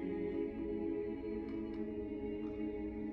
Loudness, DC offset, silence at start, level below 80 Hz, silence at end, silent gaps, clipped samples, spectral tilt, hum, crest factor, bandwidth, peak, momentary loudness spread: -41 LUFS; under 0.1%; 0 s; -56 dBFS; 0 s; none; under 0.1%; -10 dB/octave; none; 12 dB; 5.2 kHz; -28 dBFS; 3 LU